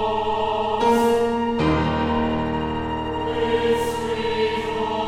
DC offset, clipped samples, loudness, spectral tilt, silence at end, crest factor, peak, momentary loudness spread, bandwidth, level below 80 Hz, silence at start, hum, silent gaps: under 0.1%; under 0.1%; -22 LUFS; -6 dB/octave; 0 s; 14 dB; -8 dBFS; 6 LU; 16 kHz; -40 dBFS; 0 s; none; none